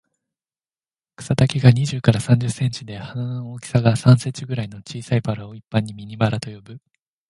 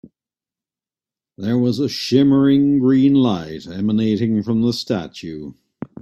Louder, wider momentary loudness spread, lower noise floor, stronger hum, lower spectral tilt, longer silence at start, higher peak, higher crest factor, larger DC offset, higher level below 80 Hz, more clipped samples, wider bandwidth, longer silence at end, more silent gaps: second, -20 LUFS vs -17 LUFS; about the same, 16 LU vs 17 LU; about the same, under -90 dBFS vs under -90 dBFS; neither; about the same, -6.5 dB/octave vs -7 dB/octave; second, 1.2 s vs 1.4 s; about the same, 0 dBFS vs -2 dBFS; about the same, 20 dB vs 16 dB; neither; first, -48 dBFS vs -56 dBFS; neither; about the same, 11.5 kHz vs 12 kHz; first, 0.5 s vs 0.15 s; neither